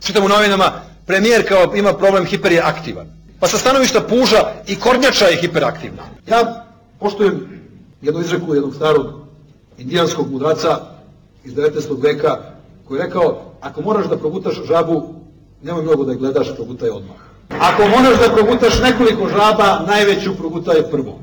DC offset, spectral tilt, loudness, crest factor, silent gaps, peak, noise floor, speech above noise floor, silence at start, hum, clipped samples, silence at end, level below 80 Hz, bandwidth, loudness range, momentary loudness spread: under 0.1%; -4.5 dB/octave; -15 LUFS; 10 dB; none; -6 dBFS; -45 dBFS; 31 dB; 0 s; none; under 0.1%; 0 s; -40 dBFS; over 20 kHz; 7 LU; 15 LU